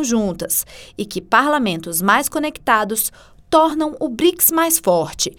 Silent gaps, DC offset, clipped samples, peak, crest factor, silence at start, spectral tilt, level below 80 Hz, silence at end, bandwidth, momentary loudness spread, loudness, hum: none; under 0.1%; under 0.1%; 0 dBFS; 18 dB; 0 s; -3 dB/octave; -48 dBFS; 0.05 s; over 20 kHz; 9 LU; -17 LUFS; none